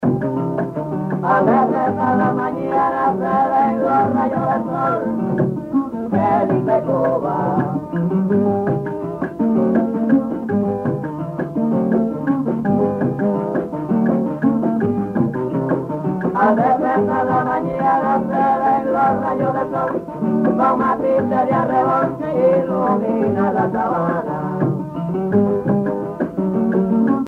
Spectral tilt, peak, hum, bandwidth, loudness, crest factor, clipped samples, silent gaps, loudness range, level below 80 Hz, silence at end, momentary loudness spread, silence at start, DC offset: -10 dB/octave; -4 dBFS; none; 5.4 kHz; -18 LUFS; 14 dB; under 0.1%; none; 2 LU; -52 dBFS; 0 s; 6 LU; 0 s; under 0.1%